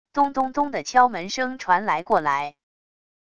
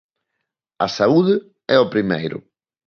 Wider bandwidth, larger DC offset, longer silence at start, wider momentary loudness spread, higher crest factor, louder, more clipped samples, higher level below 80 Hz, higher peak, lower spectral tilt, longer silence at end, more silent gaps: first, 10 kHz vs 7 kHz; first, 0.5% vs under 0.1%; second, 0.05 s vs 0.8 s; about the same, 8 LU vs 10 LU; about the same, 20 dB vs 18 dB; second, -22 LUFS vs -18 LUFS; neither; about the same, -60 dBFS vs -58 dBFS; about the same, -4 dBFS vs -2 dBFS; second, -3.5 dB/octave vs -6.5 dB/octave; first, 0.65 s vs 0.5 s; neither